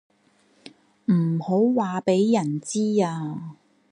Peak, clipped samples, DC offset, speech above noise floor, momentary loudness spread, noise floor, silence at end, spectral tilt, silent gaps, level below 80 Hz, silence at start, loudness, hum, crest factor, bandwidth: -8 dBFS; under 0.1%; under 0.1%; 40 dB; 12 LU; -62 dBFS; 0.4 s; -7 dB/octave; none; -74 dBFS; 0.65 s; -23 LUFS; none; 16 dB; 11 kHz